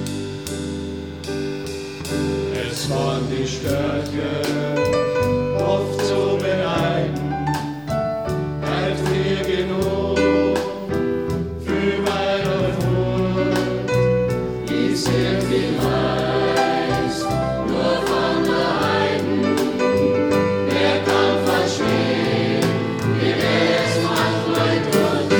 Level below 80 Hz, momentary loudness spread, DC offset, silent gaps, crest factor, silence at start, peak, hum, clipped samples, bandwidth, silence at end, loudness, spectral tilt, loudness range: -40 dBFS; 6 LU; 0.2%; none; 16 dB; 0 s; -4 dBFS; none; under 0.1%; over 20 kHz; 0 s; -20 LUFS; -5.5 dB/octave; 4 LU